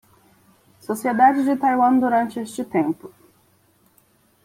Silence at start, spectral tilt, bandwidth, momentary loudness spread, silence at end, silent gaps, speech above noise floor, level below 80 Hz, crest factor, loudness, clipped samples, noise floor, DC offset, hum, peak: 0.9 s; -6 dB/octave; 16 kHz; 13 LU; 1.35 s; none; 41 dB; -66 dBFS; 18 dB; -20 LUFS; under 0.1%; -60 dBFS; under 0.1%; none; -4 dBFS